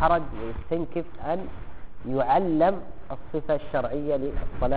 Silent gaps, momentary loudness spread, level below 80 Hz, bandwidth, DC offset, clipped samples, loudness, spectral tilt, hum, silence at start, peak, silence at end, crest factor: none; 18 LU; -38 dBFS; 4.7 kHz; 2%; under 0.1%; -27 LUFS; -6 dB/octave; none; 0 s; -8 dBFS; 0 s; 18 dB